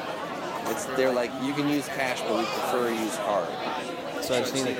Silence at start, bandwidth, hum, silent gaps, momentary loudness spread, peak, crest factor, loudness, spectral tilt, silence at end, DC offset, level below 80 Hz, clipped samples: 0 s; 17 kHz; none; none; 7 LU; -12 dBFS; 16 dB; -28 LUFS; -4 dB/octave; 0 s; under 0.1%; -64 dBFS; under 0.1%